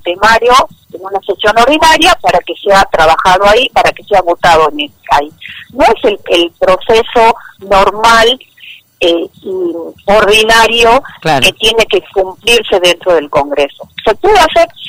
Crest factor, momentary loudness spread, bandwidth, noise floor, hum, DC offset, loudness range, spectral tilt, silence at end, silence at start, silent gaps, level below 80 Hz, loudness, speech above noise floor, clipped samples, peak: 8 dB; 11 LU; 16.5 kHz; -32 dBFS; none; under 0.1%; 3 LU; -2.5 dB/octave; 0 s; 0.05 s; none; -32 dBFS; -8 LUFS; 23 dB; under 0.1%; 0 dBFS